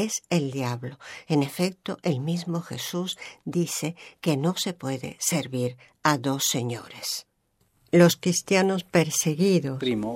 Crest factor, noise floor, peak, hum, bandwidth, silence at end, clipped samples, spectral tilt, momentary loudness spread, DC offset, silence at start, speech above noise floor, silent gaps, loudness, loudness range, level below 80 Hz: 20 dB; -69 dBFS; -6 dBFS; none; 16.5 kHz; 0 s; under 0.1%; -4.5 dB/octave; 10 LU; under 0.1%; 0 s; 44 dB; none; -26 LUFS; 5 LU; -68 dBFS